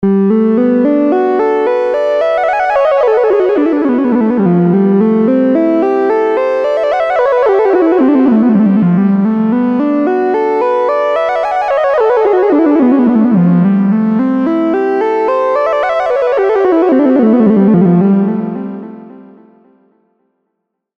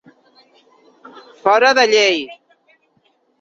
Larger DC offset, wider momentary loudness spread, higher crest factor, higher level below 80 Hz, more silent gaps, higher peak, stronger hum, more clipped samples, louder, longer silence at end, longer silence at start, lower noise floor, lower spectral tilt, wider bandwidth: neither; second, 4 LU vs 11 LU; second, 10 dB vs 18 dB; first, -52 dBFS vs -70 dBFS; neither; about the same, 0 dBFS vs 0 dBFS; neither; neither; first, -11 LUFS vs -14 LUFS; first, 1.75 s vs 1.05 s; second, 0 s vs 1.45 s; first, -72 dBFS vs -61 dBFS; first, -9.5 dB/octave vs -1.5 dB/octave; second, 6.2 kHz vs 7.8 kHz